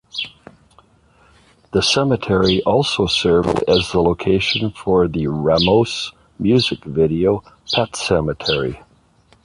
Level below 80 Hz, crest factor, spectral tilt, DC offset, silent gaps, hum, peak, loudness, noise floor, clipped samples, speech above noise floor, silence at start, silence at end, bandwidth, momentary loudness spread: -40 dBFS; 16 dB; -5 dB/octave; under 0.1%; none; none; -2 dBFS; -17 LUFS; -54 dBFS; under 0.1%; 37 dB; 0.15 s; 0.65 s; 11 kHz; 8 LU